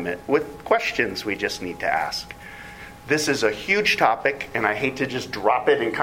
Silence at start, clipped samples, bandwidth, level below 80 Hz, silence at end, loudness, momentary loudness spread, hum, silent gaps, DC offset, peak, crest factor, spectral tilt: 0 s; under 0.1%; 16.5 kHz; -52 dBFS; 0 s; -22 LUFS; 14 LU; none; none; under 0.1%; -2 dBFS; 22 dB; -3.5 dB/octave